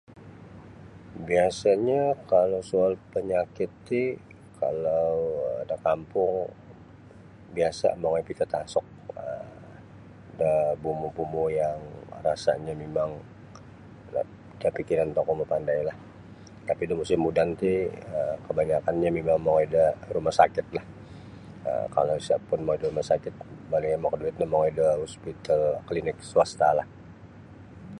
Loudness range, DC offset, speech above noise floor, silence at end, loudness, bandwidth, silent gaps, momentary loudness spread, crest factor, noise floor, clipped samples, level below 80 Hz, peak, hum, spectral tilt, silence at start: 5 LU; under 0.1%; 23 dB; 0 s; -27 LUFS; 11 kHz; none; 22 LU; 22 dB; -49 dBFS; under 0.1%; -54 dBFS; -4 dBFS; none; -6.5 dB/octave; 0.1 s